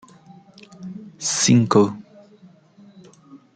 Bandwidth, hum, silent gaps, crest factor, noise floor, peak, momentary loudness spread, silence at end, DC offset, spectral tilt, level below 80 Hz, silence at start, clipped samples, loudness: 9.6 kHz; none; none; 20 dB; -50 dBFS; -2 dBFS; 23 LU; 0.2 s; under 0.1%; -4.5 dB/octave; -64 dBFS; 0.8 s; under 0.1%; -18 LUFS